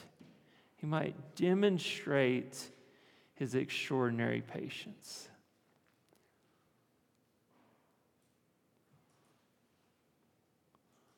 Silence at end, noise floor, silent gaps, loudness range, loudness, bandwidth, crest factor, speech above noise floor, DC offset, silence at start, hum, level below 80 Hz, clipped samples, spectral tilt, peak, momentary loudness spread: 5.9 s; -75 dBFS; none; 16 LU; -35 LUFS; 18 kHz; 22 dB; 40 dB; under 0.1%; 0 s; none; -86 dBFS; under 0.1%; -5.5 dB/octave; -18 dBFS; 17 LU